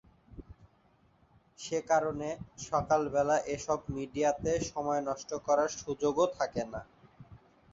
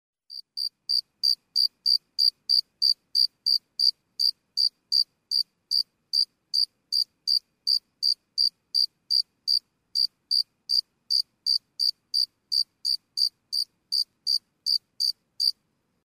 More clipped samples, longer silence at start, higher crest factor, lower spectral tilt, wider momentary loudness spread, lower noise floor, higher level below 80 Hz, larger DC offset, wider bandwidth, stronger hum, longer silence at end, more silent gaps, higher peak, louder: neither; about the same, 0.3 s vs 0.3 s; about the same, 18 dB vs 18 dB; first, -4.5 dB/octave vs 4 dB/octave; first, 11 LU vs 5 LU; second, -67 dBFS vs -73 dBFS; first, -58 dBFS vs -82 dBFS; neither; second, 8 kHz vs 15.5 kHz; neither; second, 0.35 s vs 0.55 s; neither; second, -14 dBFS vs -10 dBFS; second, -32 LUFS vs -24 LUFS